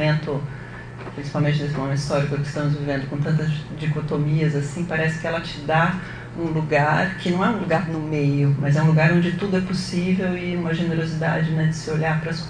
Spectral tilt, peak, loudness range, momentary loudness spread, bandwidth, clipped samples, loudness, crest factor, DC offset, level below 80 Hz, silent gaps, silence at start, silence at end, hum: -7 dB/octave; -4 dBFS; 4 LU; 8 LU; 10 kHz; under 0.1%; -22 LUFS; 16 dB; under 0.1%; -46 dBFS; none; 0 s; 0 s; none